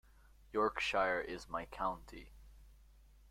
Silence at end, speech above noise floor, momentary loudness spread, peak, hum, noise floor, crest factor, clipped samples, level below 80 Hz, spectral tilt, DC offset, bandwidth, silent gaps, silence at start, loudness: 0.45 s; 25 dB; 16 LU; -20 dBFS; none; -63 dBFS; 22 dB; under 0.1%; -60 dBFS; -4 dB/octave; under 0.1%; 16 kHz; none; 0.5 s; -38 LUFS